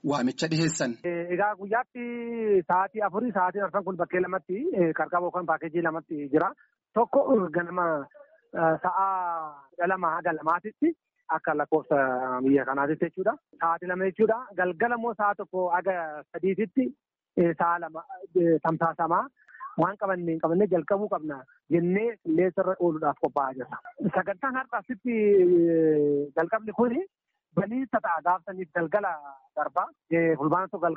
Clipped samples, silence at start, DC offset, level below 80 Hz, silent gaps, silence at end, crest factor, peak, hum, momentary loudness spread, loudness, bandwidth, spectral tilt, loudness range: under 0.1%; 0.05 s; under 0.1%; -70 dBFS; none; 0 s; 14 dB; -12 dBFS; none; 9 LU; -27 LUFS; 7.4 kHz; -5.5 dB/octave; 3 LU